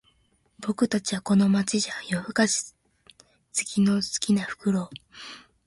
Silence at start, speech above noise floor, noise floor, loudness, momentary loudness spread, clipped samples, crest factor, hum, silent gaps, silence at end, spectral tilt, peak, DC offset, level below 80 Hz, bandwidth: 0.6 s; 41 dB; -66 dBFS; -25 LUFS; 18 LU; under 0.1%; 20 dB; none; none; 0.25 s; -4 dB/octave; -8 dBFS; under 0.1%; -64 dBFS; 11.5 kHz